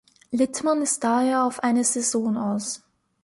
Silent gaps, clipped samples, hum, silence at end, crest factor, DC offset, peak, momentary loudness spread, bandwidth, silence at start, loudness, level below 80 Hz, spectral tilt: none; under 0.1%; none; 0.45 s; 14 dB; under 0.1%; -10 dBFS; 8 LU; 11.5 kHz; 0.3 s; -23 LUFS; -68 dBFS; -3.5 dB/octave